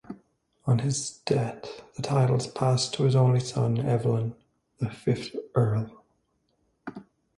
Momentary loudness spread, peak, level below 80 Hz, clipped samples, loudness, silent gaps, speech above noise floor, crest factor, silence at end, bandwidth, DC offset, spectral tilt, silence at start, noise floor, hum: 18 LU; -10 dBFS; -60 dBFS; under 0.1%; -27 LUFS; none; 47 dB; 18 dB; 0.35 s; 11.5 kHz; under 0.1%; -6 dB/octave; 0.1 s; -72 dBFS; none